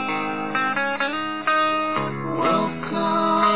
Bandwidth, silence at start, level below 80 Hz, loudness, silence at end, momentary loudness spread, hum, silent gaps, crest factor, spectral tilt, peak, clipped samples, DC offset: 4 kHz; 0 s; -60 dBFS; -22 LUFS; 0 s; 5 LU; none; none; 16 dB; -9 dB/octave; -6 dBFS; under 0.1%; 0.7%